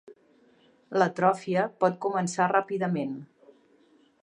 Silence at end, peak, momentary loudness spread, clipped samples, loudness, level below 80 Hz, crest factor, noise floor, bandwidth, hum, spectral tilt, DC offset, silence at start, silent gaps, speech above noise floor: 1 s; -8 dBFS; 8 LU; under 0.1%; -27 LUFS; -78 dBFS; 20 dB; -62 dBFS; 10.5 kHz; none; -6 dB/octave; under 0.1%; 0.05 s; none; 36 dB